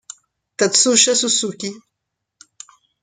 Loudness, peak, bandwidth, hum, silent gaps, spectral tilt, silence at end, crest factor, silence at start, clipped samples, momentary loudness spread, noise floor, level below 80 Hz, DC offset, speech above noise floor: -15 LUFS; 0 dBFS; 11 kHz; none; none; -1 dB/octave; 1.25 s; 20 dB; 0.6 s; under 0.1%; 18 LU; -79 dBFS; -70 dBFS; under 0.1%; 62 dB